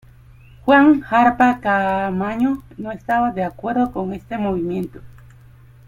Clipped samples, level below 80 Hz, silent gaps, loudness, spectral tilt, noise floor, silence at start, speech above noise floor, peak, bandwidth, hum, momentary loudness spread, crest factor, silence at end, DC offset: under 0.1%; -46 dBFS; none; -18 LUFS; -7.5 dB/octave; -45 dBFS; 0.65 s; 27 dB; -2 dBFS; 14 kHz; none; 14 LU; 18 dB; 0.8 s; under 0.1%